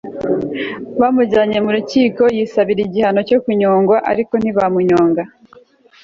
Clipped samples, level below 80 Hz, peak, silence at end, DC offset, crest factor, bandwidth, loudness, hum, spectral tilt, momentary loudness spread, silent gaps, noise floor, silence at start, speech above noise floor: under 0.1%; -52 dBFS; -2 dBFS; 0.75 s; under 0.1%; 12 dB; 7.6 kHz; -15 LUFS; none; -7 dB/octave; 7 LU; none; -46 dBFS; 0.05 s; 32 dB